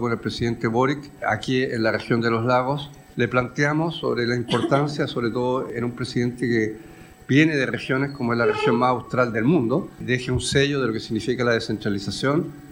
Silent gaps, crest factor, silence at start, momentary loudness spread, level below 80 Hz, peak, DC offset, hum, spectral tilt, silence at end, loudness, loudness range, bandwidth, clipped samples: none; 18 dB; 0 s; 6 LU; -50 dBFS; -4 dBFS; under 0.1%; none; -6 dB/octave; 0 s; -23 LUFS; 2 LU; 16.5 kHz; under 0.1%